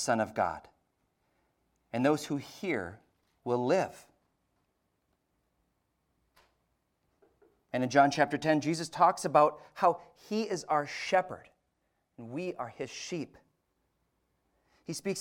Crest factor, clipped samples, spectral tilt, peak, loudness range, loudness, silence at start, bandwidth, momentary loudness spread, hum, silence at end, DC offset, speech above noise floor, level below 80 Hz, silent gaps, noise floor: 24 dB; under 0.1%; -5 dB/octave; -8 dBFS; 14 LU; -31 LUFS; 0 s; 17 kHz; 17 LU; none; 0 s; under 0.1%; 48 dB; -72 dBFS; none; -79 dBFS